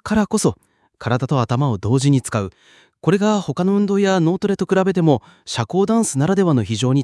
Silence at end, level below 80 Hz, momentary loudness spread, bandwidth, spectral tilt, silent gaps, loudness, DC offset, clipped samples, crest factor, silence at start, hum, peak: 0 s; -52 dBFS; 7 LU; 12 kHz; -6 dB/octave; none; -18 LUFS; under 0.1%; under 0.1%; 16 dB; 0.05 s; none; -2 dBFS